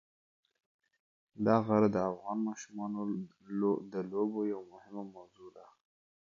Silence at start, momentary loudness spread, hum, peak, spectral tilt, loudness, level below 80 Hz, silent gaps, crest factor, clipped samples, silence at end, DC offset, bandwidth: 1.35 s; 17 LU; none; -14 dBFS; -8 dB/octave; -34 LUFS; -72 dBFS; none; 22 dB; under 0.1%; 0.75 s; under 0.1%; 7.4 kHz